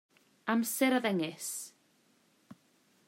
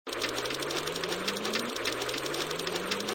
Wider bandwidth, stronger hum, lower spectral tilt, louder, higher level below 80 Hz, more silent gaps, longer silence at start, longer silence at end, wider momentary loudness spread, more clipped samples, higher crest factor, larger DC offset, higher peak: about the same, 16 kHz vs 17 kHz; neither; about the same, -3.5 dB/octave vs -2.5 dB/octave; about the same, -32 LUFS vs -32 LUFS; second, -88 dBFS vs -62 dBFS; neither; first, 0.45 s vs 0.05 s; first, 0.55 s vs 0 s; first, 13 LU vs 1 LU; neither; about the same, 18 dB vs 18 dB; neither; about the same, -16 dBFS vs -14 dBFS